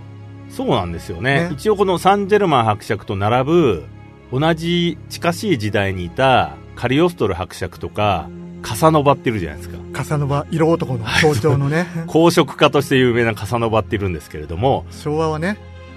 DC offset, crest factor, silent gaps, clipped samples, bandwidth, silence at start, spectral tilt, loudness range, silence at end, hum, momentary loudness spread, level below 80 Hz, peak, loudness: under 0.1%; 18 dB; none; under 0.1%; 13.5 kHz; 0 s; -6 dB/octave; 3 LU; 0 s; none; 12 LU; -42 dBFS; 0 dBFS; -18 LUFS